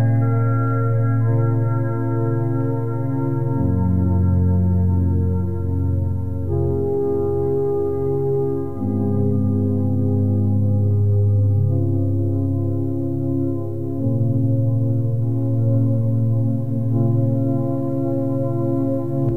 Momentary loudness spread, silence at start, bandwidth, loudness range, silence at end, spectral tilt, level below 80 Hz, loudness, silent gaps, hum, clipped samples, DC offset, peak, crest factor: 4 LU; 0 s; 2.2 kHz; 2 LU; 0 s; -12.5 dB/octave; -42 dBFS; -20 LUFS; none; none; under 0.1%; 3%; -8 dBFS; 12 dB